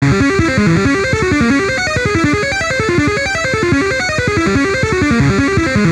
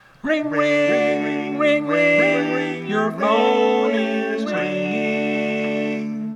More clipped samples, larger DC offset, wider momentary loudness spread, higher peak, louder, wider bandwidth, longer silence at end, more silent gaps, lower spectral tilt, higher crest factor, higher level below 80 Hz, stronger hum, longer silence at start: neither; neither; second, 2 LU vs 7 LU; first, -2 dBFS vs -6 dBFS; first, -13 LUFS vs -19 LUFS; first, 13 kHz vs 10.5 kHz; about the same, 0 s vs 0 s; neither; about the same, -5.5 dB/octave vs -6 dB/octave; about the same, 12 dB vs 14 dB; first, -30 dBFS vs -64 dBFS; neither; second, 0 s vs 0.25 s